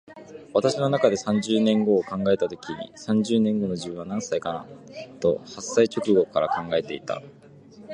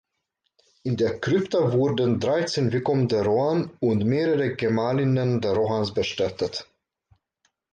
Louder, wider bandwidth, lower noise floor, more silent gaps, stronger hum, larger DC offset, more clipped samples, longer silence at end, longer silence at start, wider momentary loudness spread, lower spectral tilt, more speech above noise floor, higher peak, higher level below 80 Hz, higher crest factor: about the same, -24 LUFS vs -24 LUFS; first, 10.5 kHz vs 9.2 kHz; second, -48 dBFS vs -77 dBFS; neither; neither; neither; neither; second, 0 s vs 1.1 s; second, 0.1 s vs 0.85 s; first, 14 LU vs 4 LU; second, -5.5 dB/octave vs -7 dB/octave; second, 24 dB vs 54 dB; first, -4 dBFS vs -10 dBFS; second, -60 dBFS vs -54 dBFS; first, 20 dB vs 14 dB